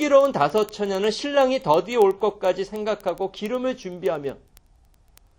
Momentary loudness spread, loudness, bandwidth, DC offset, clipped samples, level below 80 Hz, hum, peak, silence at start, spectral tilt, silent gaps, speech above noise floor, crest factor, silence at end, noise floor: 9 LU; -23 LUFS; 17 kHz; under 0.1%; under 0.1%; -56 dBFS; none; -4 dBFS; 0 s; -5 dB/octave; none; 35 dB; 18 dB; 1.05 s; -56 dBFS